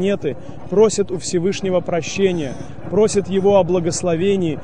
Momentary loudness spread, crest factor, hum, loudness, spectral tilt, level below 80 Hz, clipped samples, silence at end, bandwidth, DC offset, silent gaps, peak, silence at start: 9 LU; 16 dB; none; -18 LUFS; -5.5 dB/octave; -46 dBFS; under 0.1%; 0 s; 10 kHz; 2%; none; -2 dBFS; 0 s